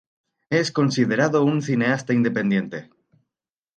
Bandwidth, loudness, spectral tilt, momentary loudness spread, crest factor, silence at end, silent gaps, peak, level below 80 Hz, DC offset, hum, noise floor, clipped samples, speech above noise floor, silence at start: 9.2 kHz; -21 LUFS; -6 dB/octave; 6 LU; 18 dB; 0.95 s; none; -4 dBFS; -68 dBFS; under 0.1%; none; -87 dBFS; under 0.1%; 67 dB; 0.5 s